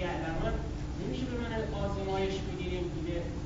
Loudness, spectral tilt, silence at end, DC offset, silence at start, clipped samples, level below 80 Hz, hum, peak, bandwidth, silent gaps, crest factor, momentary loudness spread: -35 LUFS; -5.5 dB/octave; 0 s; under 0.1%; 0 s; under 0.1%; -40 dBFS; none; -20 dBFS; 7.4 kHz; none; 14 dB; 4 LU